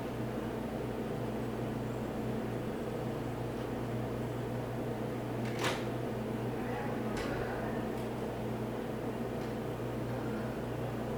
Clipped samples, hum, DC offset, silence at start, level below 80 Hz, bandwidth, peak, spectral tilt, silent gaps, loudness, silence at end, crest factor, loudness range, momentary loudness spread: under 0.1%; 60 Hz at -45 dBFS; under 0.1%; 0 s; -54 dBFS; over 20 kHz; -20 dBFS; -6.5 dB/octave; none; -37 LUFS; 0 s; 18 dB; 1 LU; 2 LU